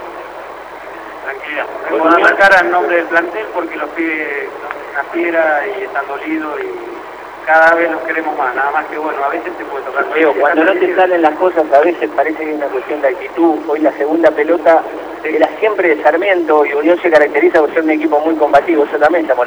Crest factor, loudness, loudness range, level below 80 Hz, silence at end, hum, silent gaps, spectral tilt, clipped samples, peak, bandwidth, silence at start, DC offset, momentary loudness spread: 14 dB; -13 LUFS; 5 LU; -54 dBFS; 0 s; 50 Hz at -55 dBFS; none; -5 dB/octave; 0.1%; 0 dBFS; over 20 kHz; 0 s; under 0.1%; 14 LU